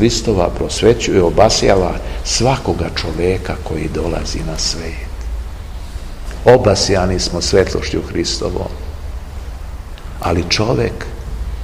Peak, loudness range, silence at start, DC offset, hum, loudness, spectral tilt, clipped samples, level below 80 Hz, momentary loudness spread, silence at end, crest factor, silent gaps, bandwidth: 0 dBFS; 6 LU; 0 s; 0.6%; none; -15 LUFS; -4.5 dB/octave; 0.2%; -26 dBFS; 19 LU; 0 s; 16 dB; none; 16 kHz